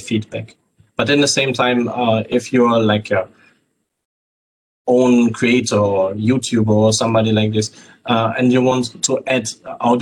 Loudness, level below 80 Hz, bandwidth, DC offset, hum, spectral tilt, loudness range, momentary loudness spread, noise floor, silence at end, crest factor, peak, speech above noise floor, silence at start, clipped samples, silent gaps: -16 LUFS; -58 dBFS; 12 kHz; under 0.1%; none; -5 dB/octave; 3 LU; 9 LU; -67 dBFS; 0 s; 12 dB; -4 dBFS; 51 dB; 0 s; under 0.1%; 4.05-4.85 s